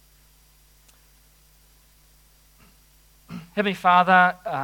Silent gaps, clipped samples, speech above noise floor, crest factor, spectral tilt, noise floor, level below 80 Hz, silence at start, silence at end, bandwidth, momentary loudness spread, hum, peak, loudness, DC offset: none; under 0.1%; 37 dB; 22 dB; -5.5 dB/octave; -56 dBFS; -60 dBFS; 3.3 s; 0 s; 18 kHz; 24 LU; none; -4 dBFS; -19 LUFS; under 0.1%